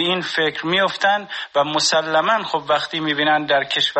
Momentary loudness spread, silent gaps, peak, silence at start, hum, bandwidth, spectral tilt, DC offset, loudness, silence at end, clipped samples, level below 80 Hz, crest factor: 4 LU; none; -4 dBFS; 0 s; none; 8.8 kHz; -2.5 dB/octave; under 0.1%; -18 LUFS; 0 s; under 0.1%; -64 dBFS; 14 dB